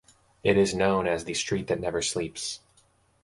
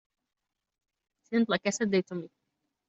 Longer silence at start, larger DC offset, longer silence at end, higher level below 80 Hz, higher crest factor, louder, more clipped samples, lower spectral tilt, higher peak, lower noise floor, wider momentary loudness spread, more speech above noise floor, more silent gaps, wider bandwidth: second, 0.45 s vs 1.3 s; neither; about the same, 0.65 s vs 0.6 s; first, -52 dBFS vs -76 dBFS; about the same, 20 dB vs 20 dB; about the same, -27 LUFS vs -29 LUFS; neither; about the same, -4 dB/octave vs -4.5 dB/octave; first, -8 dBFS vs -14 dBFS; second, -64 dBFS vs -82 dBFS; second, 10 LU vs 13 LU; second, 38 dB vs 54 dB; neither; first, 11.5 kHz vs 8 kHz